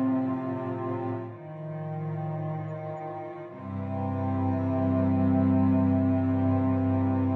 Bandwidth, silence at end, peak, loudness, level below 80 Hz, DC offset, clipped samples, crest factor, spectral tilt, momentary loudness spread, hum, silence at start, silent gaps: 4.1 kHz; 0 s; -14 dBFS; -28 LUFS; -64 dBFS; under 0.1%; under 0.1%; 14 dB; -11.5 dB/octave; 14 LU; none; 0 s; none